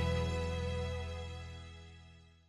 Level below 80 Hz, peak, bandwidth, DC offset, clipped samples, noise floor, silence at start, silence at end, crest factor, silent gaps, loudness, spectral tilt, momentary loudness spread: -44 dBFS; -22 dBFS; 12 kHz; under 0.1%; under 0.1%; -58 dBFS; 0 s; 0.15 s; 16 dB; none; -39 LUFS; -6 dB/octave; 20 LU